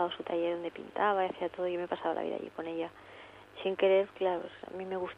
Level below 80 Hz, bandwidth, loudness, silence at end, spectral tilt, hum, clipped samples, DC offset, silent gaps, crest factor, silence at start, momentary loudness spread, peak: -74 dBFS; 5.8 kHz; -33 LUFS; 0.05 s; -6.5 dB/octave; none; under 0.1%; under 0.1%; none; 16 dB; 0 s; 15 LU; -16 dBFS